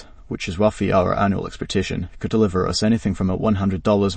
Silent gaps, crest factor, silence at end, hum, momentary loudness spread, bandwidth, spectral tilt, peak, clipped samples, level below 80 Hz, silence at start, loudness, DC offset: none; 16 dB; 0 s; none; 9 LU; 8.8 kHz; -6 dB/octave; -4 dBFS; under 0.1%; -40 dBFS; 0 s; -21 LUFS; under 0.1%